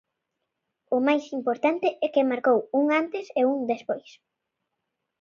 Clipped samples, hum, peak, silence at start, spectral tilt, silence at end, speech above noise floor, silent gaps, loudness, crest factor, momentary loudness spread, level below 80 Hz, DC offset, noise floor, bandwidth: under 0.1%; none; -10 dBFS; 0.9 s; -5.5 dB/octave; 1.2 s; 58 dB; none; -25 LUFS; 16 dB; 7 LU; -80 dBFS; under 0.1%; -82 dBFS; 7.2 kHz